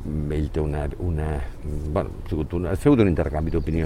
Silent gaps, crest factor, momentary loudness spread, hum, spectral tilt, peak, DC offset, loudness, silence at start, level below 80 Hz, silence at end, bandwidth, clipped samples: none; 20 dB; 11 LU; none; -8.5 dB/octave; -4 dBFS; under 0.1%; -24 LUFS; 0 s; -30 dBFS; 0 s; 13 kHz; under 0.1%